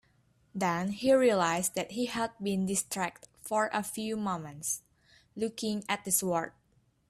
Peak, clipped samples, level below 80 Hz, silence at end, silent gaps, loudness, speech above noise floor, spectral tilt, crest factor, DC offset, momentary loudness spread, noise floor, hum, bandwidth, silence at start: -12 dBFS; under 0.1%; -68 dBFS; 0.6 s; none; -31 LUFS; 39 dB; -4 dB/octave; 20 dB; under 0.1%; 11 LU; -70 dBFS; none; 15.5 kHz; 0.55 s